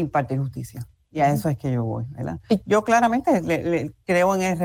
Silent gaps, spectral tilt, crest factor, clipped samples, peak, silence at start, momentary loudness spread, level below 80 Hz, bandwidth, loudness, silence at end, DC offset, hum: none; -6.5 dB/octave; 14 dB; under 0.1%; -8 dBFS; 0 s; 13 LU; -52 dBFS; 20 kHz; -22 LUFS; 0 s; under 0.1%; none